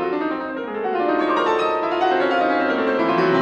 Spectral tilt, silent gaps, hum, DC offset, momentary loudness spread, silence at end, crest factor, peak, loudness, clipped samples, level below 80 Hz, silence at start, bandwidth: -6 dB/octave; none; none; under 0.1%; 6 LU; 0 s; 12 dB; -8 dBFS; -20 LUFS; under 0.1%; -60 dBFS; 0 s; 8.4 kHz